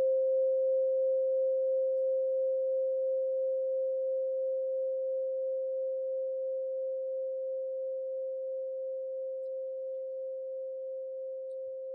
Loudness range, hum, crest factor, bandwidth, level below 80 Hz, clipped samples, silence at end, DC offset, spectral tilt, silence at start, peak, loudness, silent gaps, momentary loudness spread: 8 LU; none; 8 dB; 0.8 kHz; under -90 dBFS; under 0.1%; 0 s; under 0.1%; 7 dB/octave; 0 s; -24 dBFS; -33 LUFS; none; 10 LU